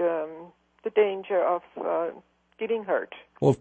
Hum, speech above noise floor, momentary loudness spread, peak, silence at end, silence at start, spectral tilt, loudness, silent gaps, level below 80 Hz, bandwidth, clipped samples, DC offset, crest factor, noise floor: none; 22 dB; 13 LU; -8 dBFS; 0.05 s; 0 s; -7.5 dB/octave; -28 LUFS; none; -68 dBFS; 8.6 kHz; under 0.1%; under 0.1%; 20 dB; -48 dBFS